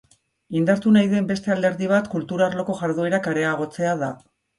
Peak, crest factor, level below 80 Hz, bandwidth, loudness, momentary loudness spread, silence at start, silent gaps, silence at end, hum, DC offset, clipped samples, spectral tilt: -4 dBFS; 18 dB; -62 dBFS; 11.5 kHz; -22 LUFS; 10 LU; 0.5 s; none; 0.45 s; none; under 0.1%; under 0.1%; -6.5 dB/octave